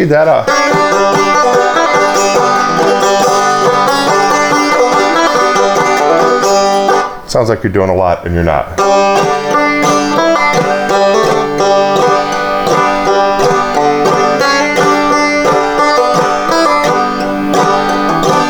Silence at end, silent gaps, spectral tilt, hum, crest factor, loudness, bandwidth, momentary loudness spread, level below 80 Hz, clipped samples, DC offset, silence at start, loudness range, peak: 0 s; none; -4 dB/octave; none; 10 dB; -10 LUFS; over 20 kHz; 3 LU; -36 dBFS; under 0.1%; under 0.1%; 0 s; 2 LU; 0 dBFS